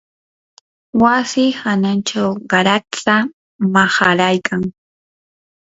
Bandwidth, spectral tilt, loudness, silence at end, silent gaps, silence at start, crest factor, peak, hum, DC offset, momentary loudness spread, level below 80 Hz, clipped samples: 8 kHz; -4.5 dB/octave; -15 LUFS; 0.95 s; 3.33-3.59 s; 0.95 s; 16 dB; 0 dBFS; none; under 0.1%; 9 LU; -54 dBFS; under 0.1%